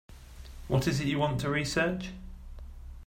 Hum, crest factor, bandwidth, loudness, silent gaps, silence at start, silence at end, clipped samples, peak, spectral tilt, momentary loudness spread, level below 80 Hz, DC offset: none; 18 dB; 16 kHz; -30 LUFS; none; 0.1 s; 0 s; under 0.1%; -14 dBFS; -5.5 dB/octave; 20 LU; -46 dBFS; under 0.1%